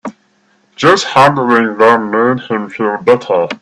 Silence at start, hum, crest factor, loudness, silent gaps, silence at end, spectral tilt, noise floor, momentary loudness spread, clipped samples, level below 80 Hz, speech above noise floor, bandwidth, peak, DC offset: 0.05 s; none; 12 dB; -11 LUFS; none; 0.05 s; -5 dB/octave; -55 dBFS; 8 LU; under 0.1%; -52 dBFS; 44 dB; 12 kHz; 0 dBFS; under 0.1%